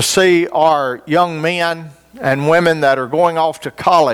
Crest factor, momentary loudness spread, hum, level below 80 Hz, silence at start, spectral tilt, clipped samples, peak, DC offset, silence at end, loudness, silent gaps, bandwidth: 14 dB; 7 LU; none; -54 dBFS; 0 s; -4 dB/octave; under 0.1%; 0 dBFS; under 0.1%; 0 s; -14 LUFS; none; 17.5 kHz